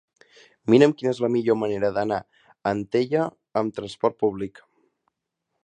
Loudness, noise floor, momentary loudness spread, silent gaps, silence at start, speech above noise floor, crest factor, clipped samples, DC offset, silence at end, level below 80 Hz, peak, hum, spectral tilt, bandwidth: -24 LUFS; -80 dBFS; 13 LU; none; 0.65 s; 58 dB; 22 dB; under 0.1%; under 0.1%; 1.15 s; -62 dBFS; -2 dBFS; none; -7 dB/octave; 9.8 kHz